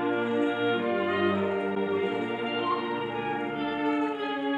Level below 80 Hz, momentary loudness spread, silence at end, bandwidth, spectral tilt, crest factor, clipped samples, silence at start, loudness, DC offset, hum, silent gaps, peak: -70 dBFS; 5 LU; 0 s; 8.6 kHz; -7 dB/octave; 14 dB; under 0.1%; 0 s; -28 LUFS; under 0.1%; none; none; -14 dBFS